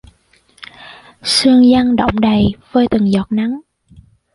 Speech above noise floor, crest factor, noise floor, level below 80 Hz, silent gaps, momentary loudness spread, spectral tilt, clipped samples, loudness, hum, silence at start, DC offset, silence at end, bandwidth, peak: 41 dB; 14 dB; -53 dBFS; -38 dBFS; none; 16 LU; -5 dB/octave; under 0.1%; -13 LUFS; none; 0.8 s; under 0.1%; 0.75 s; 11.5 kHz; -2 dBFS